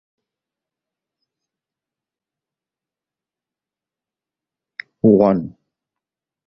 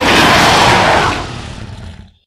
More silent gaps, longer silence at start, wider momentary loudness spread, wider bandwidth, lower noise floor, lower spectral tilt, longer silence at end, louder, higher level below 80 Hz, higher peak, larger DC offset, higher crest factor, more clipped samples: neither; first, 5.05 s vs 0 s; about the same, 23 LU vs 21 LU; second, 5.8 kHz vs 19.5 kHz; first, -89 dBFS vs -32 dBFS; first, -11 dB/octave vs -3.5 dB/octave; first, 1 s vs 0.3 s; second, -16 LUFS vs -9 LUFS; second, -58 dBFS vs -30 dBFS; about the same, -2 dBFS vs 0 dBFS; neither; first, 22 dB vs 12 dB; second, under 0.1% vs 0.2%